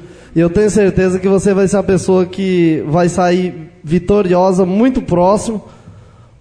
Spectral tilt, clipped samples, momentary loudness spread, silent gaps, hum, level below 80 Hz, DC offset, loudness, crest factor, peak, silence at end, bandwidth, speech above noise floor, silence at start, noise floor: -7 dB/octave; under 0.1%; 6 LU; none; none; -36 dBFS; under 0.1%; -13 LUFS; 12 dB; -2 dBFS; 0.4 s; 10.5 kHz; 28 dB; 0 s; -40 dBFS